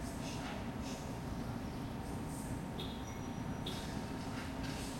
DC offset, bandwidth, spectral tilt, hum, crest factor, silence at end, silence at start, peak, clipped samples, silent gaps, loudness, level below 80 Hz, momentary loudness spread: under 0.1%; 16 kHz; -5 dB/octave; none; 14 dB; 0 s; 0 s; -28 dBFS; under 0.1%; none; -43 LUFS; -52 dBFS; 2 LU